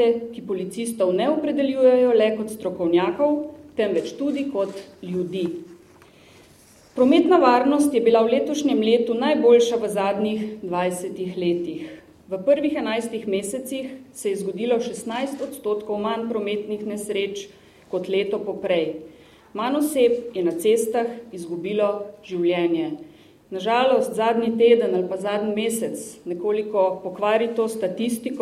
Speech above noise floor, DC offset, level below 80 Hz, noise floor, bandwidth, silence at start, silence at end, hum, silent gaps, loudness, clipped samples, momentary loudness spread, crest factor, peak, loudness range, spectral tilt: 30 dB; under 0.1%; -64 dBFS; -52 dBFS; 13.5 kHz; 0 s; 0 s; none; none; -22 LUFS; under 0.1%; 13 LU; 18 dB; -4 dBFS; 7 LU; -5 dB/octave